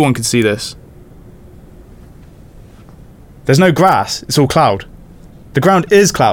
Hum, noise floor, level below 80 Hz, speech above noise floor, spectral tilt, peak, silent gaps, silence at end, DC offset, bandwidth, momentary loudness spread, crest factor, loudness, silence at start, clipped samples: none; -38 dBFS; -40 dBFS; 27 dB; -5 dB/octave; 0 dBFS; none; 0 s; under 0.1%; 19 kHz; 12 LU; 14 dB; -12 LUFS; 0 s; under 0.1%